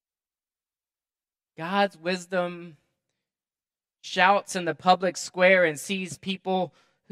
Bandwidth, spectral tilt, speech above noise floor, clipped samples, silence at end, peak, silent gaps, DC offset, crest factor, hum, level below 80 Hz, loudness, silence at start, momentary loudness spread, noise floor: 14 kHz; -4 dB/octave; over 65 dB; under 0.1%; 0.4 s; -4 dBFS; none; under 0.1%; 24 dB; none; -78 dBFS; -25 LUFS; 1.6 s; 13 LU; under -90 dBFS